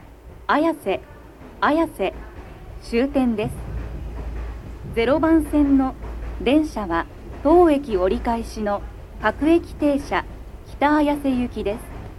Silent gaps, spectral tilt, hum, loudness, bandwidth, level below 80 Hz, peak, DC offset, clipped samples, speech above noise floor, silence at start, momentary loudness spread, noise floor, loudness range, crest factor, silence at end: none; -6.5 dB/octave; none; -21 LUFS; 13 kHz; -36 dBFS; -4 dBFS; under 0.1%; under 0.1%; 22 dB; 0 s; 17 LU; -41 dBFS; 5 LU; 18 dB; 0 s